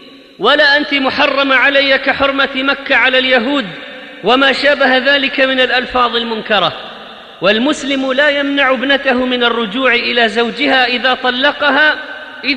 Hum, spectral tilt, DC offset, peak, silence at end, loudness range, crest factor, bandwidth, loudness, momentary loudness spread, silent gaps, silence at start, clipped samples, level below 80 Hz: none; -3.5 dB/octave; under 0.1%; 0 dBFS; 0 s; 3 LU; 12 dB; 10 kHz; -11 LUFS; 8 LU; none; 0 s; under 0.1%; -48 dBFS